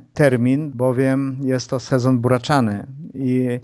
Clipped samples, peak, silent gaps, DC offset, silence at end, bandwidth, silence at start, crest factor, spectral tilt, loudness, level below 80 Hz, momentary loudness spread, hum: under 0.1%; -2 dBFS; none; under 0.1%; 0 s; 11 kHz; 0.15 s; 18 dB; -7 dB/octave; -19 LUFS; -54 dBFS; 6 LU; none